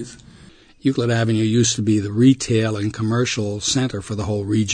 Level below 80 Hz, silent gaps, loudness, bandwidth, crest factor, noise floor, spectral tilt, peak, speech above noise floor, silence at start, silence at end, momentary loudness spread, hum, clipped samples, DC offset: -50 dBFS; none; -19 LUFS; 9.6 kHz; 16 dB; -47 dBFS; -5 dB/octave; -4 dBFS; 28 dB; 0 s; 0 s; 8 LU; none; under 0.1%; under 0.1%